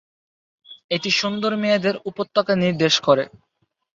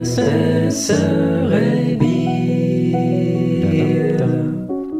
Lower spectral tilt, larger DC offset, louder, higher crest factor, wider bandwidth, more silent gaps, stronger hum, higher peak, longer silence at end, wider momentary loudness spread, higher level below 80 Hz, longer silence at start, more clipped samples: second, -4.5 dB/octave vs -6.5 dB/octave; neither; second, -20 LUFS vs -17 LUFS; about the same, 18 dB vs 14 dB; second, 7.8 kHz vs 15 kHz; first, 0.84-0.89 s vs none; neither; about the same, -4 dBFS vs -2 dBFS; first, 0.65 s vs 0 s; first, 8 LU vs 2 LU; second, -62 dBFS vs -48 dBFS; first, 0.7 s vs 0 s; neither